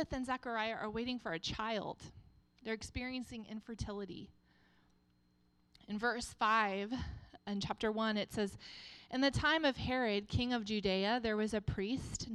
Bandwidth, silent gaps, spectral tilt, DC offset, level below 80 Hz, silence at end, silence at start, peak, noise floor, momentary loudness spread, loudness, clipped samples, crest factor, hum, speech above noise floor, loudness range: 12.5 kHz; none; -4.5 dB/octave; under 0.1%; -56 dBFS; 0 s; 0 s; -20 dBFS; -73 dBFS; 15 LU; -37 LUFS; under 0.1%; 20 dB; none; 35 dB; 11 LU